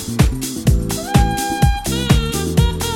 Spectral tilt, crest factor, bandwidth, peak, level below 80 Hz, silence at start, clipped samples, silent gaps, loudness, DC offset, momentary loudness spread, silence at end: -5 dB/octave; 16 dB; 17 kHz; 0 dBFS; -22 dBFS; 0 s; under 0.1%; none; -17 LUFS; under 0.1%; 3 LU; 0 s